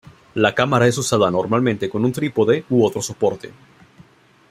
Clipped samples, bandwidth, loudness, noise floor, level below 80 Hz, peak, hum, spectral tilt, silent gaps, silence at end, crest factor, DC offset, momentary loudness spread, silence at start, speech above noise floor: under 0.1%; 15.5 kHz; -18 LUFS; -50 dBFS; -56 dBFS; -2 dBFS; none; -5.5 dB/octave; none; 1 s; 18 dB; under 0.1%; 6 LU; 0.35 s; 32 dB